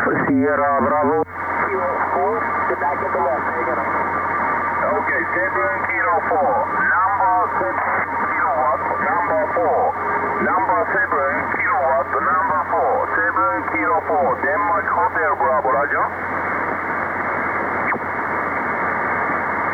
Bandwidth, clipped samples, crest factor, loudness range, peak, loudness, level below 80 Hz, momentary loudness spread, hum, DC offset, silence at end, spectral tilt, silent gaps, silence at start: 19.5 kHz; under 0.1%; 10 dB; 2 LU; -8 dBFS; -19 LUFS; -54 dBFS; 4 LU; none; under 0.1%; 0 s; -8 dB/octave; none; 0 s